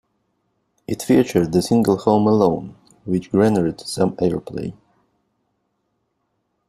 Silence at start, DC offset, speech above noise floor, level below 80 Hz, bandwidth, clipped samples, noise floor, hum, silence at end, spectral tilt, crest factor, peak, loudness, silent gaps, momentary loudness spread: 0.9 s; under 0.1%; 54 dB; -52 dBFS; 14.5 kHz; under 0.1%; -72 dBFS; none; 1.95 s; -6.5 dB/octave; 18 dB; -2 dBFS; -19 LUFS; none; 14 LU